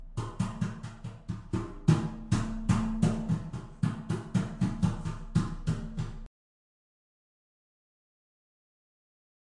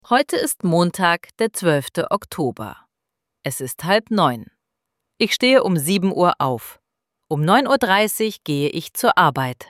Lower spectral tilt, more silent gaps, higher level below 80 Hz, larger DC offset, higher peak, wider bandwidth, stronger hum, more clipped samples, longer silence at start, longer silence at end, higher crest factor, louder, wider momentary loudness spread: first, -7 dB/octave vs -4.5 dB/octave; neither; first, -44 dBFS vs -60 dBFS; neither; second, -10 dBFS vs -2 dBFS; second, 11.5 kHz vs 16.5 kHz; neither; neither; about the same, 0 s vs 0.1 s; first, 3.3 s vs 0.05 s; about the same, 22 dB vs 18 dB; second, -32 LUFS vs -19 LUFS; about the same, 13 LU vs 11 LU